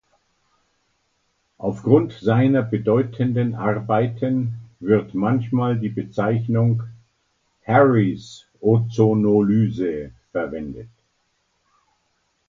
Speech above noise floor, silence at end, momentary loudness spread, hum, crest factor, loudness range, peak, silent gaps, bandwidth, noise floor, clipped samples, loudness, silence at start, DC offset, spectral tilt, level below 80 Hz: 50 dB; 1.6 s; 13 LU; none; 20 dB; 3 LU; -2 dBFS; none; 7.4 kHz; -69 dBFS; under 0.1%; -20 LUFS; 1.6 s; under 0.1%; -9.5 dB/octave; -54 dBFS